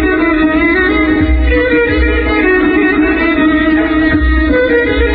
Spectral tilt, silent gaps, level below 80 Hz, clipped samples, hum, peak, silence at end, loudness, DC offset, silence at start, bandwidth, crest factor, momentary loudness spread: -5 dB/octave; none; -18 dBFS; under 0.1%; none; 0 dBFS; 0 s; -10 LUFS; 0.1%; 0 s; 4.9 kHz; 10 dB; 1 LU